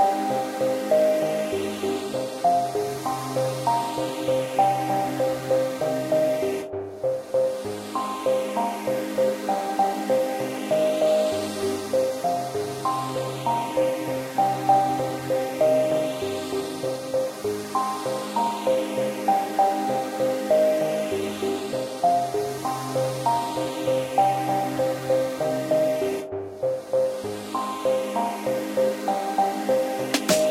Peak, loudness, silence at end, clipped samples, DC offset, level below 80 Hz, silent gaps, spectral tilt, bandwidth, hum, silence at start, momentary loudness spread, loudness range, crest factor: -6 dBFS; -25 LUFS; 0 s; under 0.1%; under 0.1%; -64 dBFS; none; -4.5 dB/octave; 16 kHz; none; 0 s; 7 LU; 2 LU; 18 dB